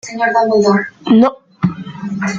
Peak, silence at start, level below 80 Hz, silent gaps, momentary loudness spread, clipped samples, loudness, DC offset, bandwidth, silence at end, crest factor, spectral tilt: -2 dBFS; 0.05 s; -54 dBFS; none; 10 LU; under 0.1%; -14 LUFS; under 0.1%; 7.8 kHz; 0 s; 12 dB; -6.5 dB/octave